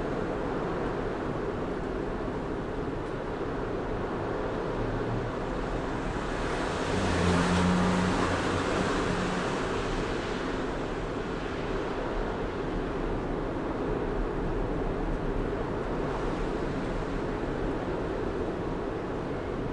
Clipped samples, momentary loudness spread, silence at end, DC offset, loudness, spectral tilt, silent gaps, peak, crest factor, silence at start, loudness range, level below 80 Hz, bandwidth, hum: under 0.1%; 7 LU; 0 s; under 0.1%; -31 LUFS; -6 dB/octave; none; -14 dBFS; 16 dB; 0 s; 5 LU; -38 dBFS; 11.5 kHz; none